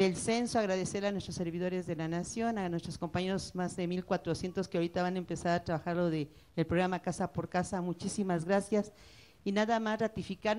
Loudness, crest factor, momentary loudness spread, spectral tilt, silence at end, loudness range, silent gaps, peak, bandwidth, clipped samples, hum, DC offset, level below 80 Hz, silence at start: -34 LUFS; 16 dB; 6 LU; -5.5 dB/octave; 0 s; 2 LU; none; -18 dBFS; 12 kHz; under 0.1%; none; under 0.1%; -60 dBFS; 0 s